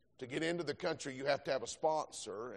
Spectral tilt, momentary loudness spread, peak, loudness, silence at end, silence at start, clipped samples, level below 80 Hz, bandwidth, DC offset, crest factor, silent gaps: -4 dB/octave; 7 LU; -20 dBFS; -38 LUFS; 0 s; 0.2 s; under 0.1%; -76 dBFS; 11 kHz; under 0.1%; 18 dB; none